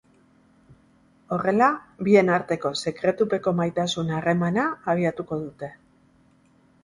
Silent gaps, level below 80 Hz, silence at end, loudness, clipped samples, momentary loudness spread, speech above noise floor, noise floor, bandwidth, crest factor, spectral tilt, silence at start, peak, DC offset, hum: none; -60 dBFS; 1.1 s; -23 LUFS; under 0.1%; 12 LU; 36 dB; -59 dBFS; 11.5 kHz; 20 dB; -6 dB/octave; 1.3 s; -4 dBFS; under 0.1%; none